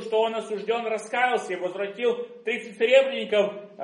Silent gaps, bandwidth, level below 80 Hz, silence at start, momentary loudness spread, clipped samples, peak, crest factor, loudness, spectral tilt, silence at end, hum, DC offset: none; 11.5 kHz; -84 dBFS; 0 s; 10 LU; under 0.1%; -6 dBFS; 18 dB; -25 LUFS; -3.5 dB/octave; 0 s; none; under 0.1%